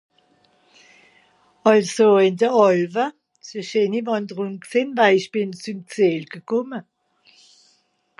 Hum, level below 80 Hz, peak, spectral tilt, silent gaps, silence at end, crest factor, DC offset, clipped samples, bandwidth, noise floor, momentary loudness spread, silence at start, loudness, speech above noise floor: none; -76 dBFS; -2 dBFS; -5.5 dB/octave; none; 1.4 s; 20 dB; under 0.1%; under 0.1%; 11.5 kHz; -64 dBFS; 15 LU; 1.65 s; -20 LUFS; 45 dB